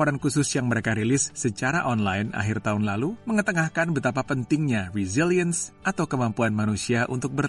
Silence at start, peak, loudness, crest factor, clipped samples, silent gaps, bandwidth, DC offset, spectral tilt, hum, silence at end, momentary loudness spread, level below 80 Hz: 0 s; -10 dBFS; -25 LUFS; 14 dB; under 0.1%; none; 11.5 kHz; under 0.1%; -5 dB/octave; none; 0 s; 4 LU; -54 dBFS